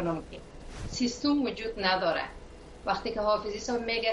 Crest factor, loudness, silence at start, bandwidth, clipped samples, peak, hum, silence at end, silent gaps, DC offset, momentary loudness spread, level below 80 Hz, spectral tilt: 20 dB; -30 LUFS; 0 s; 11 kHz; under 0.1%; -12 dBFS; none; 0 s; none; under 0.1%; 19 LU; -48 dBFS; -4 dB/octave